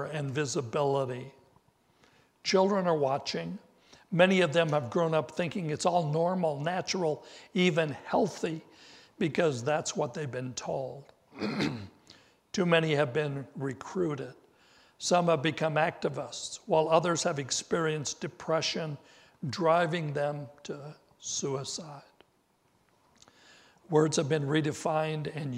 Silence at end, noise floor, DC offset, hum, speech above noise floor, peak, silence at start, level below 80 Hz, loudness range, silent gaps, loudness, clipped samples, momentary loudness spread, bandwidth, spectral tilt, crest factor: 0 s; -70 dBFS; under 0.1%; none; 40 dB; -8 dBFS; 0 s; -72 dBFS; 5 LU; none; -30 LUFS; under 0.1%; 14 LU; 12.5 kHz; -5 dB/octave; 24 dB